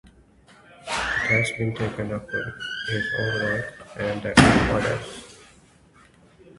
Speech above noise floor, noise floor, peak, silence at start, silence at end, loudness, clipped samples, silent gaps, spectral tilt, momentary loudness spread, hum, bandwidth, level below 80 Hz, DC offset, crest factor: 31 dB; -54 dBFS; 0 dBFS; 0.8 s; 1.15 s; -23 LUFS; under 0.1%; none; -5 dB/octave; 14 LU; none; 11.5 kHz; -42 dBFS; under 0.1%; 26 dB